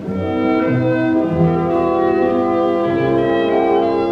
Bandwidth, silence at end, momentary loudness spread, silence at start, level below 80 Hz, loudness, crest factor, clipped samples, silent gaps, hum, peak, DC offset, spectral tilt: 5.8 kHz; 0 s; 1 LU; 0 s; -44 dBFS; -16 LUFS; 12 dB; under 0.1%; none; none; -4 dBFS; under 0.1%; -9 dB/octave